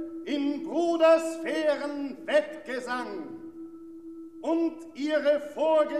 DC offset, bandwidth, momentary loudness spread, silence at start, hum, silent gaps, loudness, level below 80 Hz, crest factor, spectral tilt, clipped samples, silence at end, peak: 0.1%; 12.5 kHz; 21 LU; 0 s; none; none; -27 LUFS; -72 dBFS; 18 dB; -3.5 dB/octave; under 0.1%; 0 s; -10 dBFS